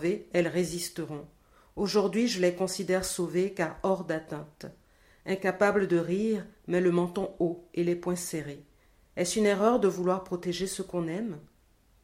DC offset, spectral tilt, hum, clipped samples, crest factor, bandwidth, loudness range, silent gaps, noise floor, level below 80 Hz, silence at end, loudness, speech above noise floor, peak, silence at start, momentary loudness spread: under 0.1%; -5 dB/octave; none; under 0.1%; 20 dB; 16.5 kHz; 2 LU; none; -64 dBFS; -60 dBFS; 0.6 s; -29 LUFS; 35 dB; -10 dBFS; 0 s; 15 LU